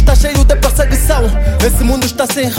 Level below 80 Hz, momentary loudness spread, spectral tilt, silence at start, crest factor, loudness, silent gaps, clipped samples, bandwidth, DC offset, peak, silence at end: -12 dBFS; 3 LU; -5 dB/octave; 0 s; 10 dB; -12 LUFS; none; under 0.1%; 17 kHz; under 0.1%; 0 dBFS; 0 s